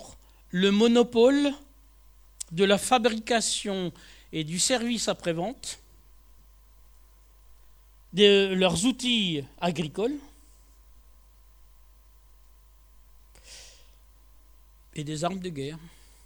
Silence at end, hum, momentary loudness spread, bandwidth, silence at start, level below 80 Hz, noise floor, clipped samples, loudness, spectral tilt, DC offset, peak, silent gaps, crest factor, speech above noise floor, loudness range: 0.35 s; none; 19 LU; over 20 kHz; 0 s; -56 dBFS; -55 dBFS; under 0.1%; -25 LUFS; -4 dB/octave; under 0.1%; -4 dBFS; none; 24 dB; 30 dB; 14 LU